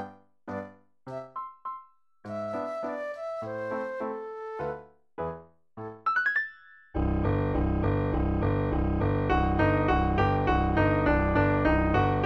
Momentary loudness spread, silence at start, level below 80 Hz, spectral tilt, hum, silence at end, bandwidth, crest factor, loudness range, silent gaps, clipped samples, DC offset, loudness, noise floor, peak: 17 LU; 0 s; -36 dBFS; -9 dB/octave; none; 0 s; 6.2 kHz; 16 dB; 11 LU; none; under 0.1%; under 0.1%; -28 LUFS; -51 dBFS; -12 dBFS